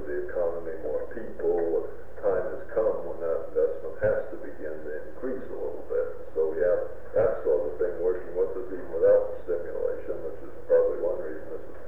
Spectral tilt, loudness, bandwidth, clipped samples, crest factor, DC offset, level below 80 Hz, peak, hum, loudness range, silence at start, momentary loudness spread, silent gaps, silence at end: -9 dB/octave; -29 LUFS; 3.1 kHz; under 0.1%; 16 dB; 3%; -52 dBFS; -10 dBFS; none; 4 LU; 0 s; 13 LU; none; 0 s